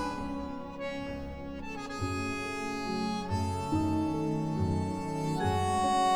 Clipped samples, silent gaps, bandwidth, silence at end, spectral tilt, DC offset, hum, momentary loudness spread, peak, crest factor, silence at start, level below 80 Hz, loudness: under 0.1%; none; 17 kHz; 0 s; -6 dB/octave; 0.2%; none; 10 LU; -18 dBFS; 14 dB; 0 s; -50 dBFS; -33 LUFS